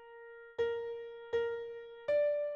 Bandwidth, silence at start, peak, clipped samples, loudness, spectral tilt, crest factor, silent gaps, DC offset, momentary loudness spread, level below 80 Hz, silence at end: 6.8 kHz; 0 s; -24 dBFS; under 0.1%; -37 LUFS; -4.5 dB/octave; 12 dB; none; under 0.1%; 15 LU; -72 dBFS; 0 s